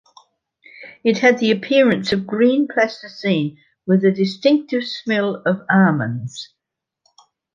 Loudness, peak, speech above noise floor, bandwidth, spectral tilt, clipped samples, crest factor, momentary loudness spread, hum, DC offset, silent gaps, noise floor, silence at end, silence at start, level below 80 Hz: -18 LUFS; -2 dBFS; 53 dB; 7.4 kHz; -6.5 dB/octave; under 0.1%; 18 dB; 13 LU; none; under 0.1%; none; -71 dBFS; 1.1 s; 0.8 s; -62 dBFS